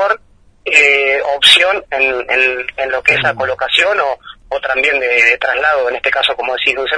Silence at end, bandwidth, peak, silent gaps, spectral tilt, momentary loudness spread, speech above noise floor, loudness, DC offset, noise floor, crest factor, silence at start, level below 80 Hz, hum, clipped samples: 0 s; 11 kHz; 0 dBFS; none; -1.5 dB/octave; 11 LU; 32 dB; -12 LUFS; under 0.1%; -46 dBFS; 14 dB; 0 s; -48 dBFS; none; 0.1%